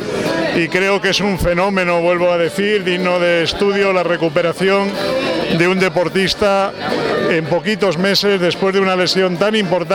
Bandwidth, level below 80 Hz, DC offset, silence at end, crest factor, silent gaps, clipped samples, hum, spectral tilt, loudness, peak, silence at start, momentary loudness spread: 17.5 kHz; -40 dBFS; under 0.1%; 0 s; 14 dB; none; under 0.1%; none; -5 dB/octave; -15 LUFS; -2 dBFS; 0 s; 3 LU